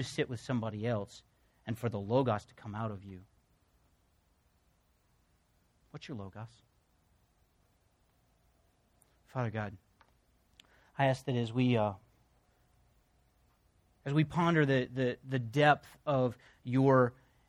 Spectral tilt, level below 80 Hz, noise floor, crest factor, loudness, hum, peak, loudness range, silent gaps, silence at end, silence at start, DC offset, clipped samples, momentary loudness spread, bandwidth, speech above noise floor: -7 dB/octave; -68 dBFS; -72 dBFS; 22 dB; -32 LUFS; none; -12 dBFS; 21 LU; none; 0.35 s; 0 s; under 0.1%; under 0.1%; 20 LU; 13 kHz; 40 dB